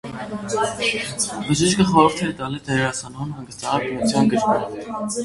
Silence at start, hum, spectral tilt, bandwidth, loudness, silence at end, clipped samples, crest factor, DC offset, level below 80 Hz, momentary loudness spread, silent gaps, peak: 0.05 s; none; -4.5 dB/octave; 11.5 kHz; -21 LUFS; 0 s; under 0.1%; 20 dB; under 0.1%; -48 dBFS; 14 LU; none; 0 dBFS